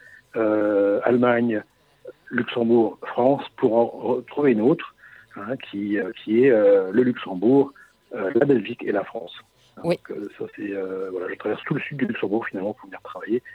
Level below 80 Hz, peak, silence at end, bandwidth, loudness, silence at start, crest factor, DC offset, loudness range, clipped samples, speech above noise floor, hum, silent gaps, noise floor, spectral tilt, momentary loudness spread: -70 dBFS; -2 dBFS; 0 s; 5.2 kHz; -22 LUFS; 0.35 s; 20 dB; under 0.1%; 8 LU; under 0.1%; 24 dB; none; none; -46 dBFS; -8.5 dB/octave; 14 LU